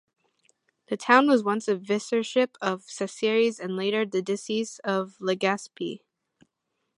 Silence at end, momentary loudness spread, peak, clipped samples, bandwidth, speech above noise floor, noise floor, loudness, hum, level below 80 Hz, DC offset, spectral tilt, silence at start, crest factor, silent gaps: 1 s; 13 LU; -4 dBFS; under 0.1%; 11.5 kHz; 54 dB; -79 dBFS; -26 LUFS; none; -80 dBFS; under 0.1%; -4.5 dB/octave; 0.9 s; 24 dB; none